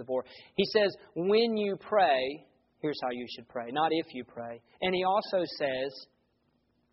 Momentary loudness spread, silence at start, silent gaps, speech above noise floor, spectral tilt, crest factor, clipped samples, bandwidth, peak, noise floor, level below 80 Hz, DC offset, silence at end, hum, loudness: 15 LU; 0 s; none; 43 dB; -2.5 dB/octave; 18 dB; under 0.1%; 5.8 kHz; -12 dBFS; -73 dBFS; -72 dBFS; under 0.1%; 0.9 s; none; -30 LUFS